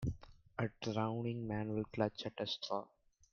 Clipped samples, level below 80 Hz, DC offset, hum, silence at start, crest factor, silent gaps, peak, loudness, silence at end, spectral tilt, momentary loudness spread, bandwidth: under 0.1%; -60 dBFS; under 0.1%; none; 0 s; 20 dB; none; -20 dBFS; -41 LUFS; 0.45 s; -6.5 dB/octave; 7 LU; 7 kHz